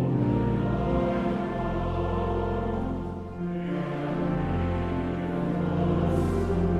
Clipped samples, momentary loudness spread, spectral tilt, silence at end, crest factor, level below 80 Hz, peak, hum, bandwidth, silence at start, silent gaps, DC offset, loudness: under 0.1%; 5 LU; -9 dB/octave; 0 s; 14 dB; -38 dBFS; -14 dBFS; none; 9.8 kHz; 0 s; none; under 0.1%; -28 LUFS